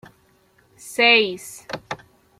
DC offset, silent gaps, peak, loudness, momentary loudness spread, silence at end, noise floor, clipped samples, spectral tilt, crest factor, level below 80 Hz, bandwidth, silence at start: under 0.1%; none; -2 dBFS; -17 LUFS; 21 LU; 0.45 s; -59 dBFS; under 0.1%; -2 dB/octave; 22 dB; -64 dBFS; 16 kHz; 0.85 s